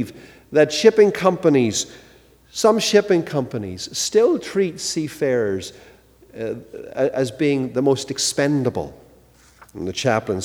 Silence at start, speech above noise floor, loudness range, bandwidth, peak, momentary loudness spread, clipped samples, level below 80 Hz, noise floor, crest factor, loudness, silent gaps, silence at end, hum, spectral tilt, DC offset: 0 s; 32 dB; 5 LU; 16.5 kHz; 0 dBFS; 15 LU; under 0.1%; -56 dBFS; -51 dBFS; 20 dB; -19 LUFS; none; 0 s; none; -4.5 dB/octave; under 0.1%